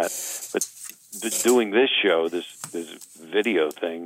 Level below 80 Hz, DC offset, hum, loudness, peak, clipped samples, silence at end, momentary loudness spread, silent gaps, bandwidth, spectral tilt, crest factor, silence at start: -78 dBFS; under 0.1%; none; -23 LUFS; -6 dBFS; under 0.1%; 0 s; 16 LU; none; 16 kHz; -2 dB/octave; 18 dB; 0 s